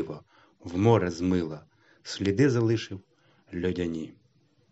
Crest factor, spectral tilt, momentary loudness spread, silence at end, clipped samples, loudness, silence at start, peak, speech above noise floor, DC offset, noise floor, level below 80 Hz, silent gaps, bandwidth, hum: 20 dB; -7 dB/octave; 21 LU; 0.6 s; under 0.1%; -27 LUFS; 0 s; -8 dBFS; 39 dB; under 0.1%; -65 dBFS; -64 dBFS; none; 8 kHz; none